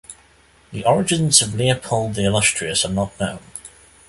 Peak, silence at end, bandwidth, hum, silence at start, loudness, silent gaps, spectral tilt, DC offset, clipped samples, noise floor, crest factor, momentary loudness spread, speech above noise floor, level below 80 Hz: 0 dBFS; 0.4 s; 12 kHz; none; 0.1 s; -18 LUFS; none; -3.5 dB/octave; under 0.1%; under 0.1%; -53 dBFS; 20 dB; 20 LU; 34 dB; -46 dBFS